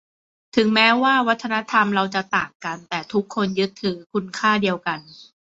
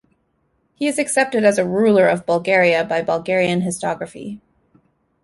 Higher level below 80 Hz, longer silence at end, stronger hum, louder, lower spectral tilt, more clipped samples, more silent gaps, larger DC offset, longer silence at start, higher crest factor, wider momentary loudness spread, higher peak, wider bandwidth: about the same, -62 dBFS vs -60 dBFS; second, 0.2 s vs 0.85 s; neither; second, -20 LUFS vs -17 LUFS; about the same, -5 dB/octave vs -4.5 dB/octave; neither; first, 2.55-2.60 s, 4.06-4.10 s vs none; neither; second, 0.55 s vs 0.8 s; about the same, 18 dB vs 16 dB; about the same, 12 LU vs 14 LU; about the same, -4 dBFS vs -2 dBFS; second, 8 kHz vs 11.5 kHz